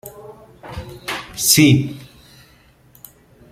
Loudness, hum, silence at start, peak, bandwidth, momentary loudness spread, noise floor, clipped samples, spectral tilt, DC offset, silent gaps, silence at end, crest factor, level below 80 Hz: -15 LUFS; none; 0.05 s; 0 dBFS; 16.5 kHz; 25 LU; -51 dBFS; under 0.1%; -3.5 dB/octave; under 0.1%; none; 1.45 s; 20 dB; -48 dBFS